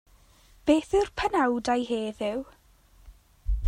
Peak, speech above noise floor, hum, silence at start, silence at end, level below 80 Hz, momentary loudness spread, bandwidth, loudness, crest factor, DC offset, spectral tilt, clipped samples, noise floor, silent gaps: -10 dBFS; 32 dB; none; 0.65 s; 0 s; -38 dBFS; 12 LU; 15.5 kHz; -27 LUFS; 18 dB; under 0.1%; -5.5 dB/octave; under 0.1%; -58 dBFS; none